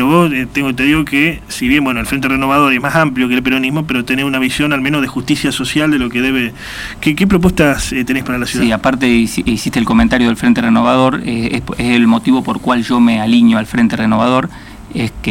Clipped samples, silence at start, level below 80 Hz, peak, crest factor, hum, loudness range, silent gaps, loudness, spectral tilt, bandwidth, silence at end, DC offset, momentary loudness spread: under 0.1%; 0 s; -34 dBFS; 0 dBFS; 12 dB; none; 2 LU; none; -13 LUFS; -5 dB/octave; 16.5 kHz; 0 s; under 0.1%; 7 LU